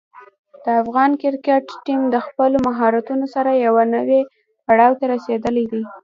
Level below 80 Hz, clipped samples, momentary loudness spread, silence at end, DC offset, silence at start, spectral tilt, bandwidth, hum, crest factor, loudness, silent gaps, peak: -56 dBFS; under 0.1%; 7 LU; 0.05 s; under 0.1%; 0.15 s; -7 dB/octave; 7.4 kHz; none; 16 dB; -18 LUFS; 0.38-0.44 s; 0 dBFS